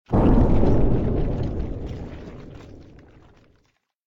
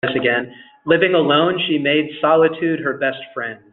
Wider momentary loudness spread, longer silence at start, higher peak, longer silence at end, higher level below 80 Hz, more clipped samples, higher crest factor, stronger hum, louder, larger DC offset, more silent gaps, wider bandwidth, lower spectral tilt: first, 23 LU vs 13 LU; about the same, 0.1 s vs 0.05 s; second, -6 dBFS vs -2 dBFS; first, 1.3 s vs 0.15 s; first, -26 dBFS vs -62 dBFS; neither; about the same, 16 dB vs 16 dB; neither; second, -22 LUFS vs -17 LUFS; neither; neither; about the same, 4.6 kHz vs 4.2 kHz; first, -10.5 dB/octave vs -8.5 dB/octave